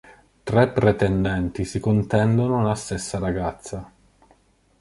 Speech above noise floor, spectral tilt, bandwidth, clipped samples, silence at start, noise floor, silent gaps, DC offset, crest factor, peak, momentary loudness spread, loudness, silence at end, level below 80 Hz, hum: 38 dB; -7 dB/octave; 11.5 kHz; under 0.1%; 0.45 s; -59 dBFS; none; under 0.1%; 20 dB; -2 dBFS; 12 LU; -22 LUFS; 0.95 s; -42 dBFS; none